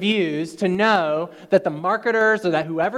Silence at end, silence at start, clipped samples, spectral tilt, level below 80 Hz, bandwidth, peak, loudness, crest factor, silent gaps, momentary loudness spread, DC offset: 0 s; 0 s; under 0.1%; -5.5 dB/octave; -66 dBFS; 12.5 kHz; -4 dBFS; -20 LUFS; 16 dB; none; 6 LU; under 0.1%